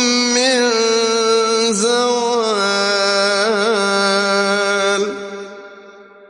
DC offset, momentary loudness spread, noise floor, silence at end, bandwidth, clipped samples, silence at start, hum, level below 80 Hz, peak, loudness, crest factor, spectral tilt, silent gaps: under 0.1%; 5 LU; -41 dBFS; 0.25 s; 11.5 kHz; under 0.1%; 0 s; none; -64 dBFS; -4 dBFS; -15 LUFS; 12 dB; -2 dB/octave; none